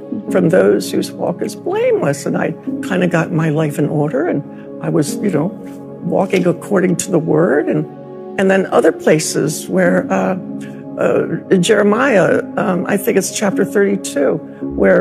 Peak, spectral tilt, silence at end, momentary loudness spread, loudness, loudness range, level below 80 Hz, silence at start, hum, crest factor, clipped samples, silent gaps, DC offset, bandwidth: 0 dBFS; -5.5 dB/octave; 0 s; 11 LU; -15 LUFS; 3 LU; -50 dBFS; 0 s; none; 14 dB; under 0.1%; none; under 0.1%; 15 kHz